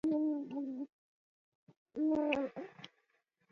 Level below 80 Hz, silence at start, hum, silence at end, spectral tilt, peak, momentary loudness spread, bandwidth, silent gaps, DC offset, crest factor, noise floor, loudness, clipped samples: -76 dBFS; 0.05 s; none; 0.65 s; -4 dB/octave; -18 dBFS; 17 LU; 6.8 kHz; 0.92-1.67 s, 1.77-1.86 s; under 0.1%; 20 dB; -79 dBFS; -37 LUFS; under 0.1%